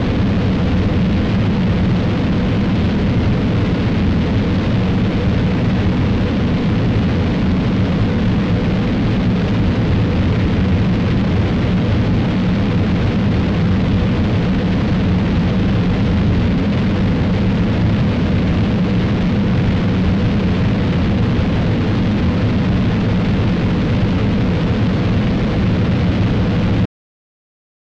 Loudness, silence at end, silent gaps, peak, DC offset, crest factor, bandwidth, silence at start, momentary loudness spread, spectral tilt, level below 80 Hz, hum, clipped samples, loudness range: -16 LUFS; 1 s; none; -6 dBFS; under 0.1%; 8 dB; 7.4 kHz; 0 s; 1 LU; -8.5 dB/octave; -26 dBFS; none; under 0.1%; 0 LU